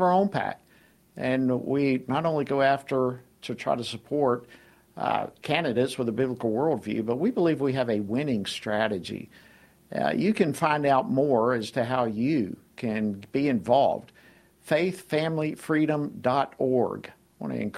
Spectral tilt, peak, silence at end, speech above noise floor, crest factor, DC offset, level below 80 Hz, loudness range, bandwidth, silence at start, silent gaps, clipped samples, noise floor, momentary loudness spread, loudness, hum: -6.5 dB/octave; -8 dBFS; 0 s; 34 dB; 18 dB; under 0.1%; -64 dBFS; 3 LU; 14.5 kHz; 0 s; none; under 0.1%; -59 dBFS; 10 LU; -26 LUFS; none